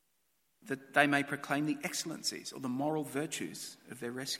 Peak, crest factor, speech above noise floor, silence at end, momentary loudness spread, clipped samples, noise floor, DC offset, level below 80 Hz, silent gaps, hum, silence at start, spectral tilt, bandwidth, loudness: -10 dBFS; 26 dB; 43 dB; 0 s; 13 LU; under 0.1%; -78 dBFS; under 0.1%; -82 dBFS; none; none; 0.65 s; -3.5 dB/octave; 16.5 kHz; -34 LUFS